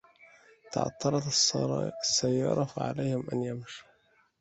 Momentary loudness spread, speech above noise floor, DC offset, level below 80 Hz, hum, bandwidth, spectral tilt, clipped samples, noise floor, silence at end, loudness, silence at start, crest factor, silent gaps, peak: 12 LU; 28 dB; under 0.1%; -66 dBFS; none; 8.2 kHz; -4 dB/octave; under 0.1%; -58 dBFS; 0.6 s; -29 LUFS; 0.2 s; 18 dB; none; -12 dBFS